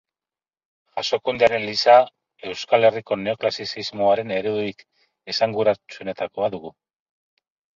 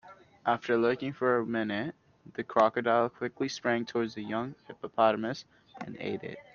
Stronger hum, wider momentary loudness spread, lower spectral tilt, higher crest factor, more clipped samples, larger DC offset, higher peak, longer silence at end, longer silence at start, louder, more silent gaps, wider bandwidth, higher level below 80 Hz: neither; about the same, 16 LU vs 14 LU; about the same, -4.5 dB/octave vs -5.5 dB/octave; about the same, 22 dB vs 22 dB; neither; neither; first, -2 dBFS vs -10 dBFS; first, 1.05 s vs 0.1 s; first, 0.95 s vs 0.05 s; first, -21 LUFS vs -30 LUFS; neither; about the same, 7.6 kHz vs 7 kHz; first, -62 dBFS vs -72 dBFS